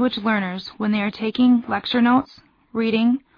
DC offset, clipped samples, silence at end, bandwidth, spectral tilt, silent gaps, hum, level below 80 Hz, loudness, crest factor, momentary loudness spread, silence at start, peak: under 0.1%; under 0.1%; 0.2 s; 5.4 kHz; -7.5 dB/octave; none; none; -60 dBFS; -20 LUFS; 14 dB; 9 LU; 0 s; -6 dBFS